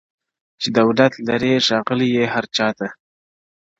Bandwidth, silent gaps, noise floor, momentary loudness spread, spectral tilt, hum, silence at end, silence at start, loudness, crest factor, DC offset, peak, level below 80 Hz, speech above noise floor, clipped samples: 7.8 kHz; none; under -90 dBFS; 8 LU; -5 dB/octave; none; 0.85 s; 0.6 s; -18 LUFS; 20 dB; under 0.1%; 0 dBFS; -58 dBFS; over 72 dB; under 0.1%